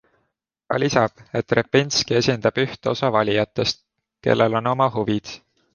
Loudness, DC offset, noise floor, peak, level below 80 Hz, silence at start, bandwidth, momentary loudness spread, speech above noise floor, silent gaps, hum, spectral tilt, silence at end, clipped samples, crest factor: -21 LUFS; under 0.1%; -74 dBFS; -2 dBFS; -54 dBFS; 0.7 s; 10 kHz; 9 LU; 54 dB; none; none; -5 dB/octave; 0.35 s; under 0.1%; 20 dB